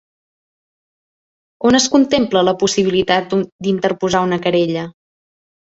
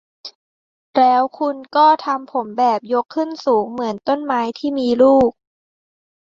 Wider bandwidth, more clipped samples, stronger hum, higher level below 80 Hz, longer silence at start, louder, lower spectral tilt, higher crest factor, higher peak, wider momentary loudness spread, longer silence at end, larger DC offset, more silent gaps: about the same, 8 kHz vs 7.6 kHz; neither; neither; about the same, -52 dBFS vs -56 dBFS; first, 1.6 s vs 0.25 s; about the same, -16 LUFS vs -17 LUFS; second, -4.5 dB/octave vs -6 dB/octave; about the same, 18 dB vs 16 dB; about the same, 0 dBFS vs -2 dBFS; second, 7 LU vs 10 LU; second, 0.85 s vs 1 s; neither; second, 3.52-3.59 s vs 0.35-0.93 s